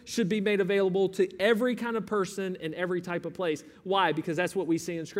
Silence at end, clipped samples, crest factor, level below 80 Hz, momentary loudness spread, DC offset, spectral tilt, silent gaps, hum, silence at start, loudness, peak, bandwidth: 0 s; under 0.1%; 18 dB; -70 dBFS; 7 LU; under 0.1%; -5 dB/octave; none; none; 0.05 s; -29 LUFS; -12 dBFS; 16 kHz